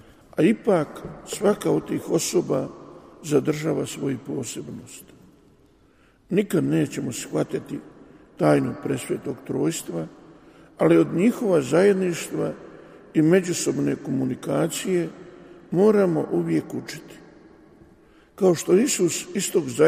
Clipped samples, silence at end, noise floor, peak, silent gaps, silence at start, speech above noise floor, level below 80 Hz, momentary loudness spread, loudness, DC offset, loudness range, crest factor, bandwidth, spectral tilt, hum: under 0.1%; 0 s; -57 dBFS; -4 dBFS; none; 0.35 s; 35 dB; -60 dBFS; 16 LU; -23 LUFS; under 0.1%; 6 LU; 18 dB; 15.5 kHz; -5.5 dB/octave; none